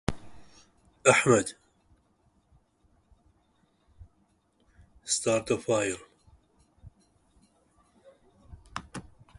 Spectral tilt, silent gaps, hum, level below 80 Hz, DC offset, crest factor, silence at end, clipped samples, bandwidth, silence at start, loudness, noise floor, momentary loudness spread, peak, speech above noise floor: -3.5 dB/octave; none; none; -56 dBFS; under 0.1%; 28 dB; 0.4 s; under 0.1%; 11.5 kHz; 0.1 s; -27 LUFS; -69 dBFS; 23 LU; -6 dBFS; 44 dB